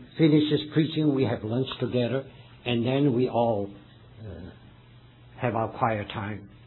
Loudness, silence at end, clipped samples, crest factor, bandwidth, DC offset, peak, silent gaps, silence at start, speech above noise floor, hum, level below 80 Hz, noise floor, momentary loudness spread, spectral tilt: -26 LUFS; 0.1 s; under 0.1%; 18 dB; 4.3 kHz; under 0.1%; -10 dBFS; none; 0 s; 26 dB; none; -58 dBFS; -52 dBFS; 19 LU; -10.5 dB/octave